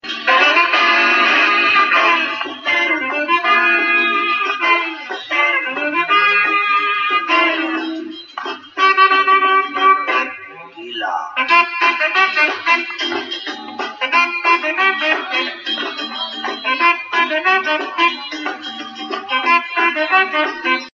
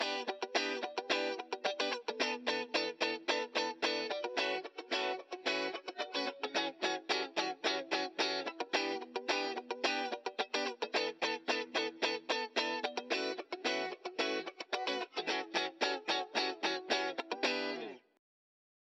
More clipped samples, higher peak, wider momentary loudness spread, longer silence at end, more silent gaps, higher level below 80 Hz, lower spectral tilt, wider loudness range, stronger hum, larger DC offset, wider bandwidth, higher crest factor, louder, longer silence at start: neither; first, 0 dBFS vs -16 dBFS; first, 13 LU vs 4 LU; second, 0.05 s vs 1 s; neither; first, -74 dBFS vs under -90 dBFS; about the same, -1.5 dB/octave vs -1.5 dB/octave; first, 4 LU vs 1 LU; neither; neither; second, 7.2 kHz vs 10 kHz; second, 16 dB vs 22 dB; first, -14 LUFS vs -36 LUFS; about the same, 0.05 s vs 0 s